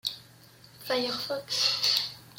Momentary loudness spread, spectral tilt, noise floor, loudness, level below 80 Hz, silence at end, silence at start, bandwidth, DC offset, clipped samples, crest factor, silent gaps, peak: 15 LU; -1.5 dB/octave; -54 dBFS; -27 LUFS; -72 dBFS; 0 s; 0.05 s; 16.5 kHz; under 0.1%; under 0.1%; 20 dB; none; -10 dBFS